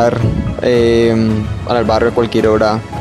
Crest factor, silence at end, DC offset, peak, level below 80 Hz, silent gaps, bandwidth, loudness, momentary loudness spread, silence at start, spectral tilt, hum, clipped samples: 12 dB; 0 s; under 0.1%; 0 dBFS; -30 dBFS; none; 12 kHz; -13 LUFS; 6 LU; 0 s; -7 dB/octave; none; under 0.1%